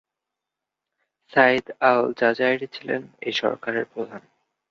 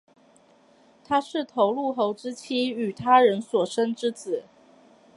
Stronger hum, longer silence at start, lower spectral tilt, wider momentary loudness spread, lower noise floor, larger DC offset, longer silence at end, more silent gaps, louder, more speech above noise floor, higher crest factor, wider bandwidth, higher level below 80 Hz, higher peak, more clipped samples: neither; first, 1.3 s vs 1.1 s; about the same, -5 dB/octave vs -5 dB/octave; about the same, 11 LU vs 13 LU; first, -86 dBFS vs -58 dBFS; neither; second, 0.5 s vs 0.75 s; neither; first, -22 LUFS vs -25 LUFS; first, 63 dB vs 34 dB; about the same, 22 dB vs 20 dB; second, 7.4 kHz vs 11.5 kHz; about the same, -70 dBFS vs -70 dBFS; about the same, -2 dBFS vs -4 dBFS; neither